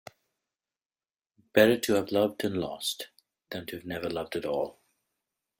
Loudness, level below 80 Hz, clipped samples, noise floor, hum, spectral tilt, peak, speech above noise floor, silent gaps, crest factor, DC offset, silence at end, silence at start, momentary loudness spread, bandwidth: -29 LUFS; -66 dBFS; under 0.1%; under -90 dBFS; none; -4.5 dB/octave; -6 dBFS; over 62 dB; none; 24 dB; under 0.1%; 0.9 s; 1.55 s; 16 LU; 17 kHz